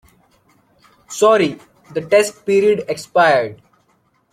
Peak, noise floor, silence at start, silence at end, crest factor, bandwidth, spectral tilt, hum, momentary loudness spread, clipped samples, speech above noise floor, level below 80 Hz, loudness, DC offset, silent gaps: -2 dBFS; -61 dBFS; 1.1 s; 0.8 s; 16 dB; 15 kHz; -4 dB/octave; none; 14 LU; under 0.1%; 46 dB; -62 dBFS; -16 LUFS; under 0.1%; none